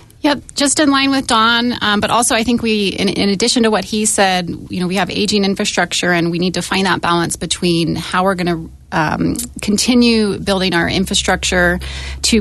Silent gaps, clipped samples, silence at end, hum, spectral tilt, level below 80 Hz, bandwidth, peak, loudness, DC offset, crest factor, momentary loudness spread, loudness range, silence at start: none; under 0.1%; 0 s; none; -3.5 dB/octave; -36 dBFS; 12.5 kHz; -2 dBFS; -15 LUFS; under 0.1%; 14 dB; 7 LU; 3 LU; 0.25 s